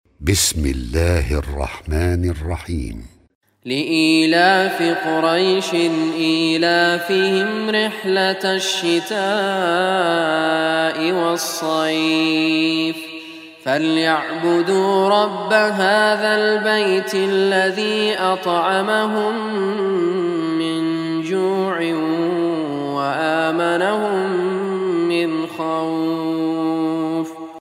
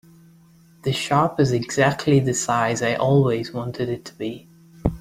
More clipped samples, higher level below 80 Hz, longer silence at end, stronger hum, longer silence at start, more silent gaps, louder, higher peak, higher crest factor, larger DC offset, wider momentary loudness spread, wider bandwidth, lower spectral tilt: neither; first, -36 dBFS vs -44 dBFS; about the same, 0 s vs 0 s; neither; second, 0.2 s vs 0.85 s; first, 3.35-3.41 s vs none; first, -18 LUFS vs -21 LUFS; about the same, 0 dBFS vs -2 dBFS; about the same, 18 dB vs 20 dB; neither; second, 7 LU vs 12 LU; about the same, 16 kHz vs 15.5 kHz; about the same, -4.5 dB/octave vs -5.5 dB/octave